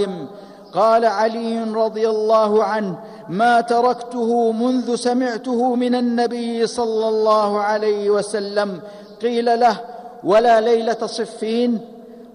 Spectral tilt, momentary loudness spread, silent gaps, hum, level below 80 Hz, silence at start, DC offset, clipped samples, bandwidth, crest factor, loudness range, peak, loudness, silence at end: -5 dB/octave; 11 LU; none; none; -64 dBFS; 0 s; under 0.1%; under 0.1%; 11 kHz; 12 dB; 1 LU; -6 dBFS; -18 LUFS; 0.05 s